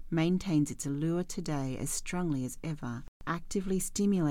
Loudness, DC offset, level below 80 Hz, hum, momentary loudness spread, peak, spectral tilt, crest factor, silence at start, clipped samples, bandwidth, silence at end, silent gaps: -33 LUFS; under 0.1%; -48 dBFS; none; 9 LU; -16 dBFS; -5.5 dB/octave; 14 dB; 0 s; under 0.1%; 17 kHz; 0 s; 3.08-3.20 s